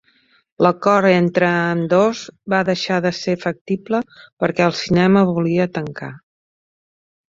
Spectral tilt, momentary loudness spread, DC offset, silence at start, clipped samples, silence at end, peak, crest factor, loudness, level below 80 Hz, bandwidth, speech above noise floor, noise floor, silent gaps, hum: -6.5 dB/octave; 11 LU; under 0.1%; 0.6 s; under 0.1%; 1.1 s; -2 dBFS; 16 dB; -17 LUFS; -56 dBFS; 7.6 kHz; 41 dB; -58 dBFS; 3.61-3.66 s, 4.32-4.37 s; none